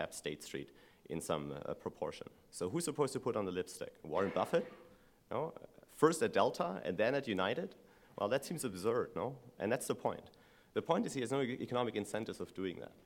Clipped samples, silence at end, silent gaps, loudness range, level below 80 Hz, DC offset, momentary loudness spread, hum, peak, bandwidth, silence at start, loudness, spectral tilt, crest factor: under 0.1%; 0.15 s; none; 4 LU; -72 dBFS; under 0.1%; 13 LU; none; -14 dBFS; 17 kHz; 0 s; -38 LUFS; -5 dB/octave; 24 dB